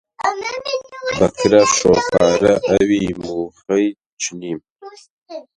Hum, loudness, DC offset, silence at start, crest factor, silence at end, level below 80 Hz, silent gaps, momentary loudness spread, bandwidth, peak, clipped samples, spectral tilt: none; -17 LUFS; under 0.1%; 0.2 s; 18 dB; 0.15 s; -46 dBFS; 4.06-4.17 s, 4.71-4.76 s, 5.10-5.22 s; 14 LU; 11 kHz; 0 dBFS; under 0.1%; -4 dB/octave